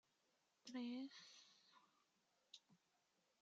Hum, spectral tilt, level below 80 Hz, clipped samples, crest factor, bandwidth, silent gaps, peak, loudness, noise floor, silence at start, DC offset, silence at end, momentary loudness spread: none; -2 dB/octave; under -90 dBFS; under 0.1%; 18 dB; 7.6 kHz; none; -40 dBFS; -54 LUFS; -85 dBFS; 0.65 s; under 0.1%; 0.65 s; 16 LU